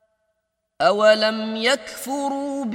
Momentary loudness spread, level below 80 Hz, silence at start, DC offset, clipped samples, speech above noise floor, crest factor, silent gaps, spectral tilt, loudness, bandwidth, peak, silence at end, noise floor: 10 LU; -70 dBFS; 0.8 s; under 0.1%; under 0.1%; 55 dB; 18 dB; none; -3 dB/octave; -20 LUFS; 16 kHz; -2 dBFS; 0 s; -75 dBFS